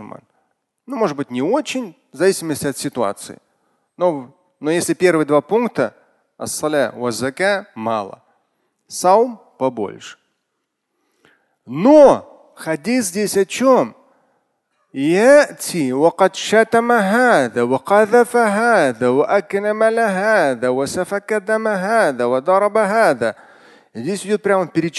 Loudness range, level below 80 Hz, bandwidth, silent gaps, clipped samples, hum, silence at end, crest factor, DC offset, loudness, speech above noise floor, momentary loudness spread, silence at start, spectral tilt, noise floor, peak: 7 LU; -62 dBFS; 12.5 kHz; none; under 0.1%; none; 0 s; 18 dB; under 0.1%; -16 LUFS; 58 dB; 12 LU; 0 s; -4.5 dB/octave; -74 dBFS; 0 dBFS